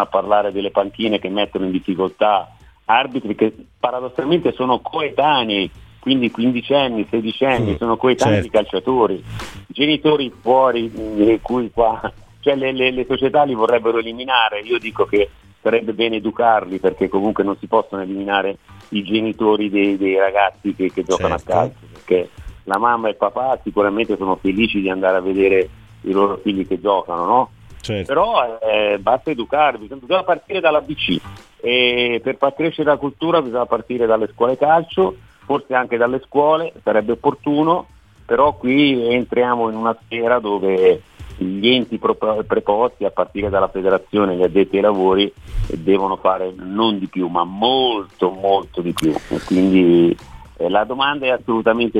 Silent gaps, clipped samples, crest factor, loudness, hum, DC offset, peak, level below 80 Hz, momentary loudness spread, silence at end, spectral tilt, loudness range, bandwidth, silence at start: none; under 0.1%; 16 dB; -18 LUFS; none; under 0.1%; -2 dBFS; -42 dBFS; 7 LU; 0 s; -6 dB/octave; 2 LU; 13 kHz; 0 s